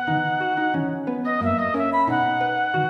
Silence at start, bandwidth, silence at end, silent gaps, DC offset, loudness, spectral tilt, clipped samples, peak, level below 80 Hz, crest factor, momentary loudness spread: 0 s; 6.2 kHz; 0 s; none; under 0.1%; -22 LUFS; -7.5 dB/octave; under 0.1%; -10 dBFS; -58 dBFS; 12 dB; 4 LU